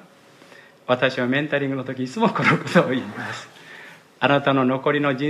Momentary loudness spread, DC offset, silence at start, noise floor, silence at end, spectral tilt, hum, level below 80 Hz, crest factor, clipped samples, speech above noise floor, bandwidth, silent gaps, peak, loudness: 19 LU; under 0.1%; 0.9 s; -50 dBFS; 0 s; -6.5 dB/octave; none; -68 dBFS; 20 dB; under 0.1%; 29 dB; 12.5 kHz; none; -2 dBFS; -21 LUFS